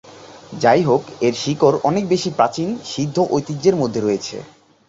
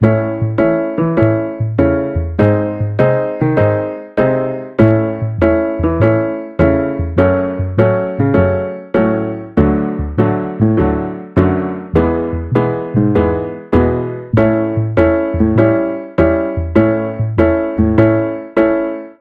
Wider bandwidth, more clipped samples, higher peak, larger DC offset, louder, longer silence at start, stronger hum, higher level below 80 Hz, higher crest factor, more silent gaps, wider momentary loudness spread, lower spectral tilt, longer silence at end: first, 8 kHz vs 4.8 kHz; neither; about the same, -2 dBFS vs 0 dBFS; neither; second, -18 LUFS vs -15 LUFS; about the same, 0.05 s vs 0 s; neither; second, -56 dBFS vs -30 dBFS; about the same, 18 dB vs 14 dB; neither; first, 9 LU vs 5 LU; second, -5.5 dB/octave vs -11 dB/octave; first, 0.45 s vs 0.1 s